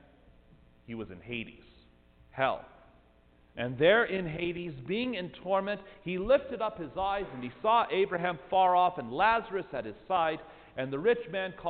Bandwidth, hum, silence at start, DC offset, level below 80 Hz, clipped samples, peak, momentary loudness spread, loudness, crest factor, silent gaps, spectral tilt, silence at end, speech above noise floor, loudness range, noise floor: 4.7 kHz; none; 0.9 s; under 0.1%; -58 dBFS; under 0.1%; -12 dBFS; 15 LU; -30 LUFS; 20 dB; none; -9 dB/octave; 0 s; 32 dB; 7 LU; -62 dBFS